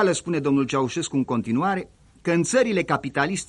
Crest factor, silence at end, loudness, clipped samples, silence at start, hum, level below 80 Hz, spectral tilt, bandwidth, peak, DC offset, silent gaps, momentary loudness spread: 16 dB; 0.05 s; -23 LUFS; under 0.1%; 0 s; none; -56 dBFS; -5 dB/octave; 11.5 kHz; -6 dBFS; under 0.1%; none; 5 LU